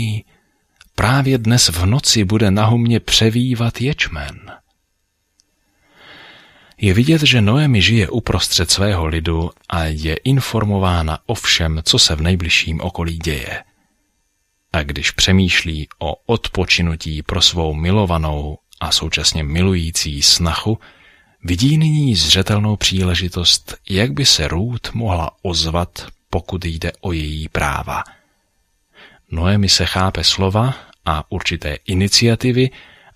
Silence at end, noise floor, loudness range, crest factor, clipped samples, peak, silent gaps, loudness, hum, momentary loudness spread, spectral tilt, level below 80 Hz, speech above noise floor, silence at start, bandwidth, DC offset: 0.35 s; -68 dBFS; 7 LU; 18 dB; under 0.1%; 0 dBFS; none; -16 LUFS; none; 12 LU; -4 dB/octave; -32 dBFS; 51 dB; 0 s; 15.5 kHz; under 0.1%